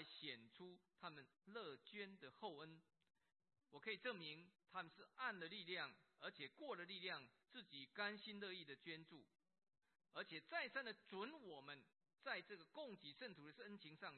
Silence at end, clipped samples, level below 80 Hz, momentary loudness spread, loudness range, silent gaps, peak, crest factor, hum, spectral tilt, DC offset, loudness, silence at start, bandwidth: 0 s; under 0.1%; under -90 dBFS; 11 LU; 3 LU; none; -32 dBFS; 24 dB; none; -1 dB/octave; under 0.1%; -54 LUFS; 0 s; 4.3 kHz